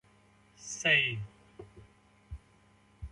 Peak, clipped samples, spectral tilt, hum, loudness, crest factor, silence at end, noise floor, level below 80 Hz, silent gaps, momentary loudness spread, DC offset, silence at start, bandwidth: -12 dBFS; under 0.1%; -2.5 dB/octave; none; -28 LUFS; 24 dB; 0.05 s; -64 dBFS; -54 dBFS; none; 26 LU; under 0.1%; 0.6 s; 11.5 kHz